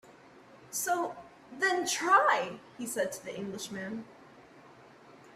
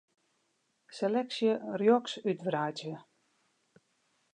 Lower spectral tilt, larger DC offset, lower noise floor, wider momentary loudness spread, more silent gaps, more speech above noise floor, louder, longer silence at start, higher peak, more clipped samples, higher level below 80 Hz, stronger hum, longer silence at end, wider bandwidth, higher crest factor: second, -2 dB/octave vs -6 dB/octave; neither; second, -56 dBFS vs -77 dBFS; about the same, 18 LU vs 16 LU; neither; second, 24 dB vs 46 dB; about the same, -31 LUFS vs -31 LUFS; second, 0.05 s vs 0.9 s; about the same, -14 dBFS vs -14 dBFS; neither; first, -76 dBFS vs -88 dBFS; neither; second, 0.05 s vs 1.35 s; first, 15.5 kHz vs 9.8 kHz; about the same, 20 dB vs 20 dB